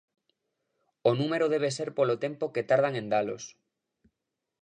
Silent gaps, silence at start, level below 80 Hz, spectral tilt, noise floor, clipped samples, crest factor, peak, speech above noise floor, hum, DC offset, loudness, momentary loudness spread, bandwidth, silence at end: none; 1.05 s; -78 dBFS; -5.5 dB/octave; -86 dBFS; under 0.1%; 20 dB; -10 dBFS; 58 dB; none; under 0.1%; -28 LUFS; 8 LU; 10 kHz; 1.15 s